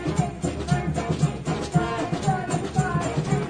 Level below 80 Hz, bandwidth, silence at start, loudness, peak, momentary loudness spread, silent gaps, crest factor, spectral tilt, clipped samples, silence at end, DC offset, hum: -40 dBFS; 10 kHz; 0 s; -25 LUFS; -8 dBFS; 2 LU; none; 16 dB; -6.5 dB/octave; under 0.1%; 0 s; under 0.1%; none